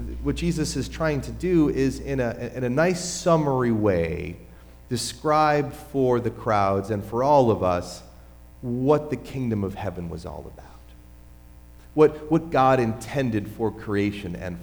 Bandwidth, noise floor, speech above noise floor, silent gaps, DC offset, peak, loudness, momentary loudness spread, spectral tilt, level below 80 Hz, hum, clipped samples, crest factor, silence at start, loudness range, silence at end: over 20 kHz; -47 dBFS; 23 dB; none; under 0.1%; -6 dBFS; -24 LUFS; 13 LU; -6 dB/octave; -42 dBFS; 60 Hz at -45 dBFS; under 0.1%; 18 dB; 0 s; 6 LU; 0 s